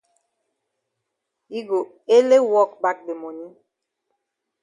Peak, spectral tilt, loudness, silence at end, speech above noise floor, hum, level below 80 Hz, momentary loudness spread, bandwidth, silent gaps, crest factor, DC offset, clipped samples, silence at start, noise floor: -4 dBFS; -4 dB/octave; -19 LUFS; 1.15 s; 60 dB; none; -80 dBFS; 19 LU; 10.5 kHz; none; 18 dB; under 0.1%; under 0.1%; 1.5 s; -80 dBFS